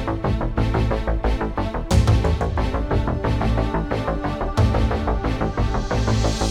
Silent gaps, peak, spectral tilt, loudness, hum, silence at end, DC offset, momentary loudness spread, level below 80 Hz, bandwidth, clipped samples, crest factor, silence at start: none; -4 dBFS; -6.5 dB/octave; -22 LUFS; none; 0 s; under 0.1%; 4 LU; -24 dBFS; 11.5 kHz; under 0.1%; 16 dB; 0 s